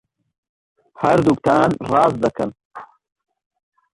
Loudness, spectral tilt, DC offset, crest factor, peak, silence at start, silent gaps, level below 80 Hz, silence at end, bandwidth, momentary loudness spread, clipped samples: -18 LUFS; -7 dB/octave; under 0.1%; 18 dB; -2 dBFS; 1 s; 2.65-2.70 s; -52 dBFS; 1.1 s; 11.5 kHz; 23 LU; under 0.1%